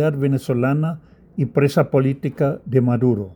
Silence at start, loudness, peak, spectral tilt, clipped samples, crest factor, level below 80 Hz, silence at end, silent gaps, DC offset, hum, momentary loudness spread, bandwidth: 0 s; -19 LUFS; -4 dBFS; -8.5 dB/octave; under 0.1%; 16 dB; -56 dBFS; 0 s; none; under 0.1%; none; 8 LU; 19 kHz